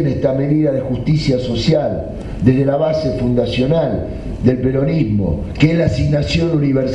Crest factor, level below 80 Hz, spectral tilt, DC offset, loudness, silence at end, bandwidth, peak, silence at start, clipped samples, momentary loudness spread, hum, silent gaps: 14 dB; -30 dBFS; -8 dB/octave; under 0.1%; -16 LUFS; 0 s; 8.6 kHz; 0 dBFS; 0 s; under 0.1%; 5 LU; none; none